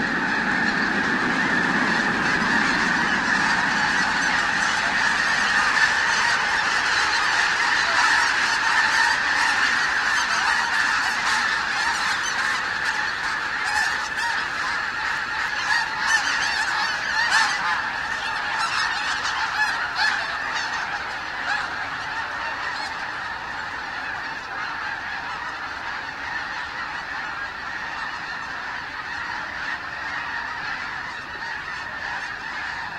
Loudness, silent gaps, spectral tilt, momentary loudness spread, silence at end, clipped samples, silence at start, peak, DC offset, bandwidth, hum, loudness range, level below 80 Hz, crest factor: -22 LUFS; none; -1.5 dB/octave; 10 LU; 0 s; under 0.1%; 0 s; -6 dBFS; under 0.1%; 16 kHz; none; 10 LU; -52 dBFS; 18 dB